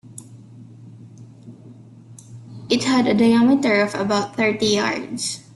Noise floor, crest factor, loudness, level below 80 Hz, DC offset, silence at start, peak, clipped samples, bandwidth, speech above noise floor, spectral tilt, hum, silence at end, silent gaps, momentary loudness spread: -43 dBFS; 16 dB; -19 LUFS; -60 dBFS; under 0.1%; 0.05 s; -6 dBFS; under 0.1%; 12 kHz; 25 dB; -4.5 dB/octave; none; 0.15 s; none; 24 LU